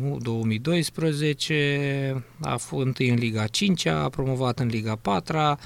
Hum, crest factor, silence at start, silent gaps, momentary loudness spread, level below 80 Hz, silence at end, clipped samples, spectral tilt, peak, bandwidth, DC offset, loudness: none; 16 dB; 0 s; none; 5 LU; -52 dBFS; 0 s; under 0.1%; -5.5 dB/octave; -8 dBFS; 15.5 kHz; under 0.1%; -25 LUFS